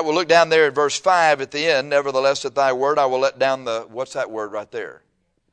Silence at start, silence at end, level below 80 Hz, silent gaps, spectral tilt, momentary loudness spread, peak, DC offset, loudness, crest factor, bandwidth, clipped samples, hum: 0 s; 0.6 s; -68 dBFS; none; -3 dB/octave; 13 LU; -2 dBFS; under 0.1%; -19 LUFS; 18 dB; 10.5 kHz; under 0.1%; none